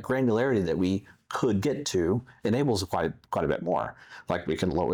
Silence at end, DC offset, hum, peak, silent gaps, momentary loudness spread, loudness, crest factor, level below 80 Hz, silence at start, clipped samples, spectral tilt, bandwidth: 0 s; under 0.1%; none; -14 dBFS; none; 7 LU; -28 LUFS; 14 dB; -54 dBFS; 0 s; under 0.1%; -6 dB/octave; 19.5 kHz